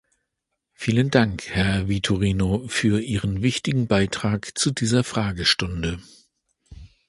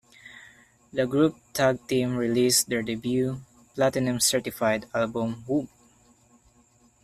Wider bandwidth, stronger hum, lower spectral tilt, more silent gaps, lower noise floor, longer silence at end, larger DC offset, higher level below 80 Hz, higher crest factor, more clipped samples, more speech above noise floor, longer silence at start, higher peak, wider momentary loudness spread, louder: second, 11.5 kHz vs 15.5 kHz; neither; about the same, -5 dB/octave vs -4 dB/octave; neither; first, -80 dBFS vs -61 dBFS; second, 0.2 s vs 1.35 s; neither; first, -40 dBFS vs -60 dBFS; about the same, 22 dB vs 18 dB; neither; first, 58 dB vs 36 dB; first, 0.8 s vs 0.25 s; first, -2 dBFS vs -8 dBFS; second, 6 LU vs 12 LU; first, -22 LUFS vs -25 LUFS